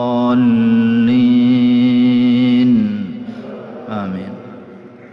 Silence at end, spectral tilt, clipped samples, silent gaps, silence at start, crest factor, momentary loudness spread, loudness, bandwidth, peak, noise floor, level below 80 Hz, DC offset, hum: 0.05 s; -9 dB/octave; under 0.1%; none; 0 s; 10 dB; 18 LU; -13 LUFS; 5.4 kHz; -4 dBFS; -37 dBFS; -54 dBFS; under 0.1%; none